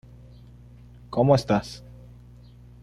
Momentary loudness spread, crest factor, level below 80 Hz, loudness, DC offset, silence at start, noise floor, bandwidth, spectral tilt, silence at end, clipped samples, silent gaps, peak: 23 LU; 20 dB; -50 dBFS; -23 LUFS; under 0.1%; 1.1 s; -48 dBFS; 12 kHz; -7 dB/octave; 1.05 s; under 0.1%; none; -6 dBFS